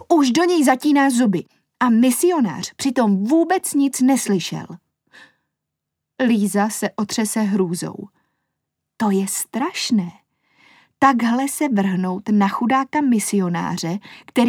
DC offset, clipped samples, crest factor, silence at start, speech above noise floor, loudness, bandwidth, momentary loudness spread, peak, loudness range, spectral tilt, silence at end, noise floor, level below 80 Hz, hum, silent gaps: under 0.1%; under 0.1%; 18 dB; 0 s; 63 dB; -19 LUFS; 18 kHz; 8 LU; -2 dBFS; 5 LU; -4.5 dB/octave; 0 s; -81 dBFS; -68 dBFS; none; none